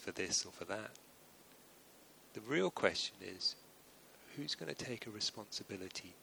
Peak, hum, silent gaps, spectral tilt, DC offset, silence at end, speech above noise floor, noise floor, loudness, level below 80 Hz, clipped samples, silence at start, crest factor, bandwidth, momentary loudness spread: -14 dBFS; none; none; -2.5 dB/octave; under 0.1%; 0 s; 21 dB; -63 dBFS; -40 LUFS; -76 dBFS; under 0.1%; 0 s; 28 dB; over 20 kHz; 25 LU